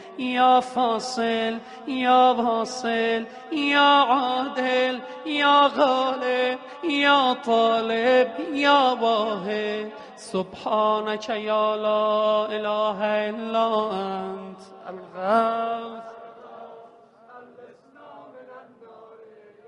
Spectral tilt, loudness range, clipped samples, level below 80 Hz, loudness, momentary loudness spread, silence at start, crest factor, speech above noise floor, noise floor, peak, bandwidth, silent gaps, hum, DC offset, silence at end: -4 dB/octave; 9 LU; under 0.1%; -72 dBFS; -22 LUFS; 16 LU; 0 s; 18 dB; 28 dB; -50 dBFS; -6 dBFS; 11 kHz; none; none; under 0.1%; 0.45 s